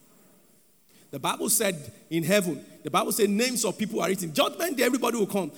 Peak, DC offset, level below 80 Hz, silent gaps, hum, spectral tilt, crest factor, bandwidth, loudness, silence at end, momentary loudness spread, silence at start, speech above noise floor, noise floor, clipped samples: -8 dBFS; under 0.1%; -76 dBFS; none; none; -3.5 dB/octave; 20 dB; over 20 kHz; -26 LUFS; 0 s; 9 LU; 1.15 s; 35 dB; -61 dBFS; under 0.1%